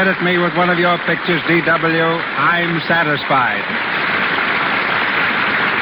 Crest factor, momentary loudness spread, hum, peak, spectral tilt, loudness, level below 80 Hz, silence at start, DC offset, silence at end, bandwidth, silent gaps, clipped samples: 12 dB; 3 LU; none; -4 dBFS; -10 dB/octave; -15 LUFS; -54 dBFS; 0 s; under 0.1%; 0 s; over 20 kHz; none; under 0.1%